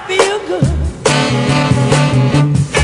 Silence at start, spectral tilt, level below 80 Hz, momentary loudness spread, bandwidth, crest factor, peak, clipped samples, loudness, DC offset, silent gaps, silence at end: 0 s; -5.5 dB/octave; -28 dBFS; 4 LU; 11 kHz; 12 dB; 0 dBFS; 0.1%; -13 LUFS; under 0.1%; none; 0 s